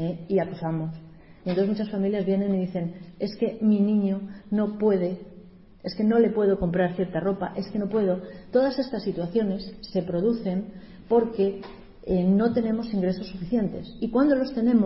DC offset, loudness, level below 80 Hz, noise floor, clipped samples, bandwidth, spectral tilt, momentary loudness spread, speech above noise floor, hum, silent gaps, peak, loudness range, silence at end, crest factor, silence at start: under 0.1%; -26 LUFS; -52 dBFS; -48 dBFS; under 0.1%; 5.8 kHz; -12 dB/octave; 11 LU; 24 dB; none; none; -10 dBFS; 2 LU; 0 s; 16 dB; 0 s